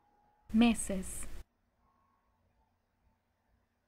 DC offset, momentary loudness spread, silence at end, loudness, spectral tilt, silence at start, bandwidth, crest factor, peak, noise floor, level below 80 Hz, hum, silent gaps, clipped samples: under 0.1%; 16 LU; 2.45 s; -32 LUFS; -4 dB/octave; 0.5 s; 15.5 kHz; 22 dB; -16 dBFS; -76 dBFS; -52 dBFS; none; none; under 0.1%